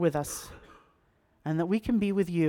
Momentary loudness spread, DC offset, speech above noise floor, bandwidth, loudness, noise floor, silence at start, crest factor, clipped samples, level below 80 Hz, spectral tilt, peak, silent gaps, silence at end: 13 LU; under 0.1%; 40 dB; 18.5 kHz; -30 LUFS; -68 dBFS; 0 s; 16 dB; under 0.1%; -54 dBFS; -6.5 dB/octave; -14 dBFS; none; 0 s